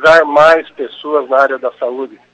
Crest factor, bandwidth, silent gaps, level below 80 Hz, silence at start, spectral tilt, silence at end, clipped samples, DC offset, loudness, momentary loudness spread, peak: 12 dB; 9 kHz; none; -48 dBFS; 0 s; -4 dB/octave; 0.25 s; 0.3%; under 0.1%; -12 LUFS; 16 LU; 0 dBFS